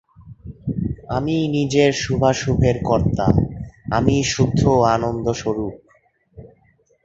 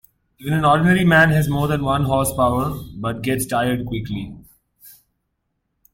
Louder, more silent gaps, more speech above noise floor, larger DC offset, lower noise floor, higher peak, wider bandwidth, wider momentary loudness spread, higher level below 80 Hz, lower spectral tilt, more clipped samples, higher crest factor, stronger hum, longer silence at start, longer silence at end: about the same, -19 LUFS vs -18 LUFS; neither; second, 41 dB vs 55 dB; neither; second, -59 dBFS vs -73 dBFS; about the same, 0 dBFS vs -2 dBFS; second, 7.8 kHz vs 16.5 kHz; second, 10 LU vs 14 LU; first, -36 dBFS vs -42 dBFS; about the same, -6 dB/octave vs -6 dB/octave; neither; about the same, 20 dB vs 18 dB; neither; second, 0.2 s vs 0.4 s; second, 0.6 s vs 1.05 s